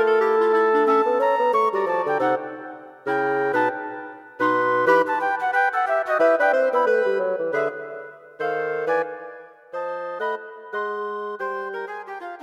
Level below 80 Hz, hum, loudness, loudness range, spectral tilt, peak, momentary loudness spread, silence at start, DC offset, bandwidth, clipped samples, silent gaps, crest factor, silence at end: -76 dBFS; none; -22 LUFS; 8 LU; -5.5 dB/octave; -6 dBFS; 16 LU; 0 s; under 0.1%; 12 kHz; under 0.1%; none; 16 dB; 0 s